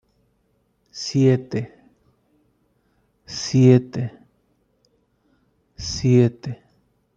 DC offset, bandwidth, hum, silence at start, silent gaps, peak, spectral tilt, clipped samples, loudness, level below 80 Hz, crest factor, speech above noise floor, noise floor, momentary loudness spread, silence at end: under 0.1%; 7.6 kHz; none; 0.95 s; none; -2 dBFS; -6.5 dB/octave; under 0.1%; -20 LUFS; -54 dBFS; 20 dB; 48 dB; -66 dBFS; 20 LU; 0.6 s